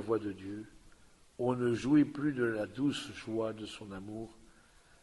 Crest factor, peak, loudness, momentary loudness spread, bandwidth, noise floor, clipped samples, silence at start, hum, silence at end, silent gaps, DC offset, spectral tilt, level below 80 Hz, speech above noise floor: 18 dB; -18 dBFS; -34 LUFS; 17 LU; 11.5 kHz; -62 dBFS; under 0.1%; 0 s; none; 0.6 s; none; under 0.1%; -6.5 dB/octave; -64 dBFS; 28 dB